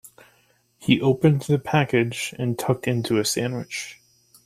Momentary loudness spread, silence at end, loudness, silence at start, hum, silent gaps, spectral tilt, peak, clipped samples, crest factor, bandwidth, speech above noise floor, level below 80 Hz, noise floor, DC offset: 12 LU; 0.5 s; -23 LUFS; 0.05 s; none; none; -5.5 dB/octave; -4 dBFS; under 0.1%; 20 dB; 15.5 kHz; 40 dB; -58 dBFS; -62 dBFS; under 0.1%